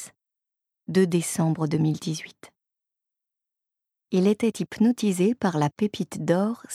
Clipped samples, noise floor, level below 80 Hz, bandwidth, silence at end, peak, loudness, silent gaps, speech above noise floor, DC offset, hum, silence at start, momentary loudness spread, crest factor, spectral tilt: under 0.1%; -87 dBFS; -68 dBFS; 15 kHz; 0 s; -8 dBFS; -25 LUFS; none; 64 dB; under 0.1%; none; 0 s; 9 LU; 18 dB; -6 dB/octave